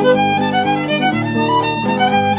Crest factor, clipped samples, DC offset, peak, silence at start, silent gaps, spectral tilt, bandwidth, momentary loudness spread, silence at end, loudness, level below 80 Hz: 14 dB; under 0.1%; under 0.1%; -2 dBFS; 0 s; none; -9.5 dB/octave; 4 kHz; 2 LU; 0 s; -15 LUFS; -48 dBFS